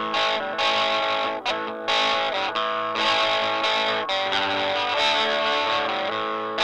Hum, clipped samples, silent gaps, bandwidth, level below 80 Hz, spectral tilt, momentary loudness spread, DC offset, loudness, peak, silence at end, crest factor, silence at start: none; under 0.1%; none; 11 kHz; -62 dBFS; -2 dB/octave; 5 LU; under 0.1%; -22 LUFS; -8 dBFS; 0 s; 16 dB; 0 s